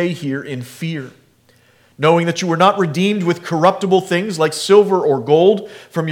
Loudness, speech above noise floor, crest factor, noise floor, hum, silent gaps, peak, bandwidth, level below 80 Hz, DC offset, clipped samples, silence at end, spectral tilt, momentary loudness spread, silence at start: -16 LUFS; 38 dB; 16 dB; -53 dBFS; none; none; 0 dBFS; 16 kHz; -68 dBFS; under 0.1%; under 0.1%; 0 s; -5.5 dB/octave; 13 LU; 0 s